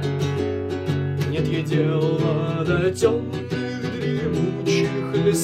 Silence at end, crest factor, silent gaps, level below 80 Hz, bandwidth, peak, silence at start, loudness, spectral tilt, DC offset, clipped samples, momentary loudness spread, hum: 0 s; 16 dB; none; -48 dBFS; 13.5 kHz; -6 dBFS; 0 s; -23 LUFS; -6.5 dB/octave; under 0.1%; under 0.1%; 6 LU; none